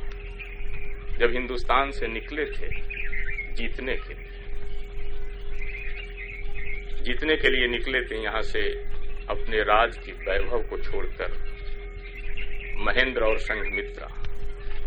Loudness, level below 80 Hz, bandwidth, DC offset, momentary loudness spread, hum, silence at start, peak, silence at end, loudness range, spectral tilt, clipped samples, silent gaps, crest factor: -28 LUFS; -30 dBFS; 5.2 kHz; under 0.1%; 17 LU; none; 0 s; -4 dBFS; 0 s; 9 LU; -5.5 dB/octave; under 0.1%; none; 20 dB